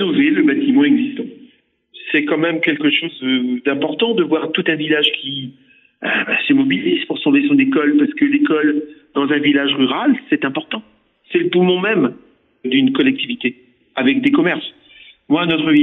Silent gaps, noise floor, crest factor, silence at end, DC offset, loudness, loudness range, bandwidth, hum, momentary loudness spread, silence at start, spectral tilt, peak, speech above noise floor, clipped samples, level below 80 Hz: none; -52 dBFS; 14 dB; 0 s; under 0.1%; -16 LUFS; 3 LU; 4.1 kHz; none; 10 LU; 0 s; -8 dB/octave; -4 dBFS; 37 dB; under 0.1%; -66 dBFS